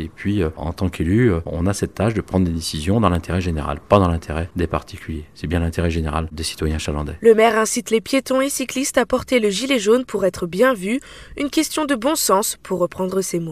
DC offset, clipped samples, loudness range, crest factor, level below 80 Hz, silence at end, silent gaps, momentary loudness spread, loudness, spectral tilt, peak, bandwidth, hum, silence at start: 0.2%; under 0.1%; 4 LU; 20 dB; -34 dBFS; 0 s; none; 8 LU; -20 LUFS; -5 dB/octave; 0 dBFS; 15.5 kHz; none; 0 s